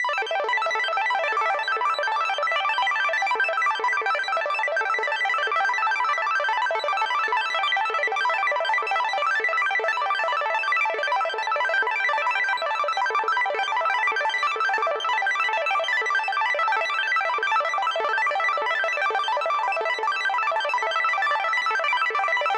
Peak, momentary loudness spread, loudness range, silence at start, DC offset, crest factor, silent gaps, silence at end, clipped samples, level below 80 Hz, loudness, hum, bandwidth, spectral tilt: -12 dBFS; 2 LU; 0 LU; 0 s; under 0.1%; 12 dB; none; 0 s; under 0.1%; under -90 dBFS; -23 LUFS; none; 12.5 kHz; 1.5 dB/octave